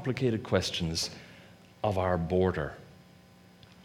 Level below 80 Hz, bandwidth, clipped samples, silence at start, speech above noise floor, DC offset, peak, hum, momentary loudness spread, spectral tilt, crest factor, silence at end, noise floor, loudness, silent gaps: -52 dBFS; 16 kHz; under 0.1%; 0 s; 27 dB; under 0.1%; -10 dBFS; none; 16 LU; -5 dB/octave; 20 dB; 0 s; -56 dBFS; -30 LUFS; none